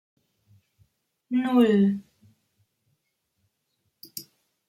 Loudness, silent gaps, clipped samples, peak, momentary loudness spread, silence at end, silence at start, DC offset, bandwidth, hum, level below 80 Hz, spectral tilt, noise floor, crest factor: -23 LUFS; none; under 0.1%; -8 dBFS; 21 LU; 0.45 s; 1.3 s; under 0.1%; 16.5 kHz; none; -72 dBFS; -7 dB/octave; -76 dBFS; 20 dB